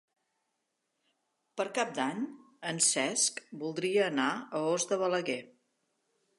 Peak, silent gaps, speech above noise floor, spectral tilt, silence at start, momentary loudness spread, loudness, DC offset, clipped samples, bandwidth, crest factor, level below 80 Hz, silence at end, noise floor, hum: -14 dBFS; none; 51 dB; -2.5 dB/octave; 1.55 s; 12 LU; -31 LUFS; under 0.1%; under 0.1%; 11.5 kHz; 20 dB; -88 dBFS; 0.9 s; -82 dBFS; none